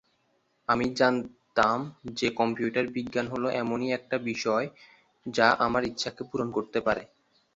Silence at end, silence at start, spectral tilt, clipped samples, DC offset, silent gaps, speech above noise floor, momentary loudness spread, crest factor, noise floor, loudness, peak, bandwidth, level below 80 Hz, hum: 0.5 s; 0.7 s; -5 dB/octave; under 0.1%; under 0.1%; none; 44 dB; 9 LU; 22 dB; -71 dBFS; -28 LUFS; -6 dBFS; 8 kHz; -60 dBFS; none